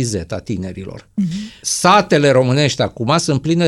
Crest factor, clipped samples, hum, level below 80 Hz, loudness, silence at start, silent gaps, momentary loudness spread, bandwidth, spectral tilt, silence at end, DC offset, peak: 16 dB; under 0.1%; none; -46 dBFS; -16 LUFS; 0 s; none; 13 LU; 14.5 kHz; -4.5 dB/octave; 0 s; under 0.1%; 0 dBFS